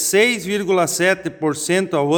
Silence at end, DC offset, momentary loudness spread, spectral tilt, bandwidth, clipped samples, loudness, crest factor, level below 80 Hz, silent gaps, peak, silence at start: 0 s; under 0.1%; 6 LU; -3.5 dB/octave; 19 kHz; under 0.1%; -18 LUFS; 14 dB; -58 dBFS; none; -4 dBFS; 0 s